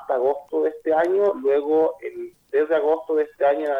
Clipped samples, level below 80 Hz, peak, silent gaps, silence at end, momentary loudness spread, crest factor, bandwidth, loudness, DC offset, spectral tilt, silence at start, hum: under 0.1%; -66 dBFS; -8 dBFS; none; 0 s; 6 LU; 14 dB; 5.4 kHz; -22 LUFS; under 0.1%; -6 dB/octave; 0 s; none